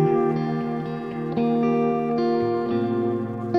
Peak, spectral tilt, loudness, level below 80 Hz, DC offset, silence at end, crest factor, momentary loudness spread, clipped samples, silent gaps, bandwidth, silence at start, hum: -8 dBFS; -9.5 dB/octave; -24 LUFS; -58 dBFS; under 0.1%; 0 s; 14 dB; 7 LU; under 0.1%; none; 6 kHz; 0 s; none